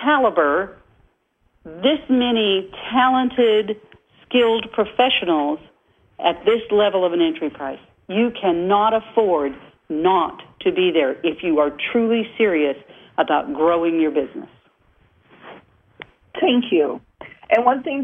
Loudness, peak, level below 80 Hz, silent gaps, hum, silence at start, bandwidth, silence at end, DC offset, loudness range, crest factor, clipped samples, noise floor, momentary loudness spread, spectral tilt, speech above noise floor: -19 LUFS; -2 dBFS; -58 dBFS; none; none; 0 s; 3.8 kHz; 0 s; under 0.1%; 4 LU; 18 dB; under 0.1%; -64 dBFS; 11 LU; -7 dB/octave; 45 dB